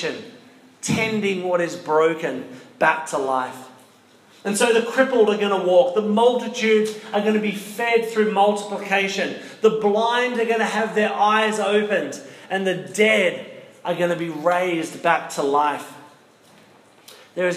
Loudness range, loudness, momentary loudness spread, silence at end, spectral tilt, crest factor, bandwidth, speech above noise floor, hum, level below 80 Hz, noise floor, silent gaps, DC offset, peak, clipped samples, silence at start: 4 LU; -20 LUFS; 11 LU; 0 s; -4 dB/octave; 18 dB; 15.5 kHz; 32 dB; none; -74 dBFS; -52 dBFS; none; under 0.1%; -2 dBFS; under 0.1%; 0 s